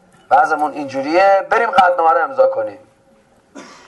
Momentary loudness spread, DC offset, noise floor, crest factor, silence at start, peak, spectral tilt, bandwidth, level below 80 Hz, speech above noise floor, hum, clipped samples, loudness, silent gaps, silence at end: 10 LU; under 0.1%; -52 dBFS; 14 dB; 0.3 s; -2 dBFS; -4.5 dB/octave; 11.5 kHz; -58 dBFS; 38 dB; none; under 0.1%; -14 LUFS; none; 0.25 s